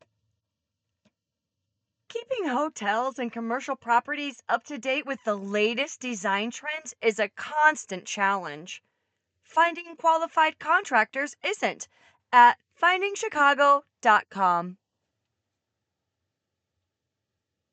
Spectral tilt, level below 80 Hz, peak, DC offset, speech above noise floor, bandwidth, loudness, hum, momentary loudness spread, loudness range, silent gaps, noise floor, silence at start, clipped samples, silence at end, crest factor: -3 dB/octave; -86 dBFS; -4 dBFS; under 0.1%; 60 dB; 9 kHz; -25 LUFS; none; 12 LU; 8 LU; none; -85 dBFS; 2.15 s; under 0.1%; 3 s; 22 dB